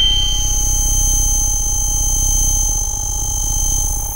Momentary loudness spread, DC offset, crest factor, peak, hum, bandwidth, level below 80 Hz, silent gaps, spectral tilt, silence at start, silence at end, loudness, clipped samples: 4 LU; under 0.1%; 10 dB; -4 dBFS; none; 16 kHz; -20 dBFS; none; -1 dB/octave; 0 s; 0 s; -15 LUFS; under 0.1%